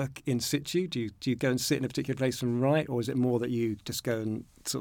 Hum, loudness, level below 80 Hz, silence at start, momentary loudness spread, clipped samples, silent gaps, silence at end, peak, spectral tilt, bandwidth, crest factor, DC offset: none; -30 LUFS; -62 dBFS; 0 s; 6 LU; under 0.1%; none; 0 s; -14 dBFS; -5 dB/octave; 19 kHz; 16 dB; under 0.1%